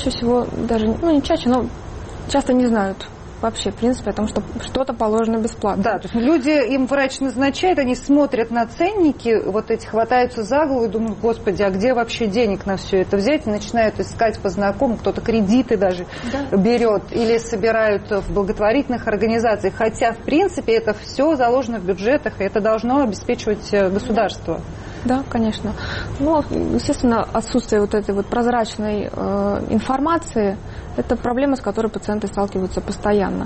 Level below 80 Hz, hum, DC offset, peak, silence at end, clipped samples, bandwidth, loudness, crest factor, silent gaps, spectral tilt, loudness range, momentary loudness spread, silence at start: -38 dBFS; none; under 0.1%; -6 dBFS; 0 s; under 0.1%; 8.8 kHz; -19 LUFS; 12 dB; none; -6 dB/octave; 3 LU; 6 LU; 0 s